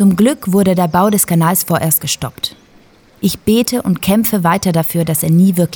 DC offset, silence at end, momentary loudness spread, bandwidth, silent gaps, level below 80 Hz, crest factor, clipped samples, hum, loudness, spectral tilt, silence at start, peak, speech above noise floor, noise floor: under 0.1%; 0 s; 8 LU; over 20 kHz; none; -46 dBFS; 12 dB; under 0.1%; none; -13 LUFS; -5 dB/octave; 0 s; 0 dBFS; 33 dB; -46 dBFS